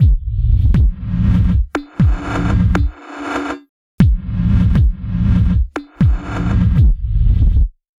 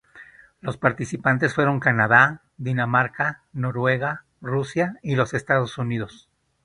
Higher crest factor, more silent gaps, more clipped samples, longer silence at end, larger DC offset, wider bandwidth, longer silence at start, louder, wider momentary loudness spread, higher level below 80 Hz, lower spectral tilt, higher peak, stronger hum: second, 14 dB vs 22 dB; first, 3.69-3.98 s vs none; neither; second, 0.3 s vs 0.55 s; neither; second, 7.6 kHz vs 10.5 kHz; second, 0 s vs 0.15 s; first, -16 LUFS vs -22 LUFS; second, 9 LU vs 13 LU; first, -16 dBFS vs -56 dBFS; first, -8.5 dB/octave vs -6.5 dB/octave; about the same, 0 dBFS vs 0 dBFS; neither